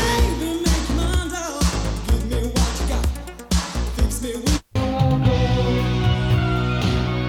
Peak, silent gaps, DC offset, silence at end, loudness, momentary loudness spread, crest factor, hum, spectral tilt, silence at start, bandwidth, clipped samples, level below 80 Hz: -6 dBFS; none; under 0.1%; 0 s; -21 LUFS; 5 LU; 14 dB; none; -5.5 dB/octave; 0 s; 16.5 kHz; under 0.1%; -24 dBFS